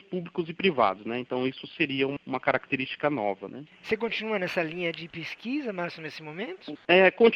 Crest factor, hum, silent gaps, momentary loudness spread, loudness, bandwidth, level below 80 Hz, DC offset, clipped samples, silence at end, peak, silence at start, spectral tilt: 20 dB; none; none; 14 LU; -28 LUFS; 7.2 kHz; -70 dBFS; under 0.1%; under 0.1%; 0 s; -6 dBFS; 0.1 s; -6.5 dB/octave